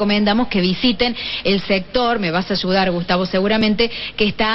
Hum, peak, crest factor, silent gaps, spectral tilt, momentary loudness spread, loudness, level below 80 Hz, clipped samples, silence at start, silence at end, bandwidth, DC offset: none; -4 dBFS; 14 dB; none; -7 dB/octave; 3 LU; -18 LUFS; -38 dBFS; under 0.1%; 0 s; 0 s; 6 kHz; under 0.1%